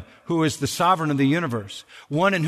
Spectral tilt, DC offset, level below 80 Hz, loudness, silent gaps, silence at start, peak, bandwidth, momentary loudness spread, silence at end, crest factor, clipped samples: -5.5 dB/octave; under 0.1%; -60 dBFS; -22 LUFS; none; 0 s; -6 dBFS; 13.5 kHz; 11 LU; 0 s; 16 dB; under 0.1%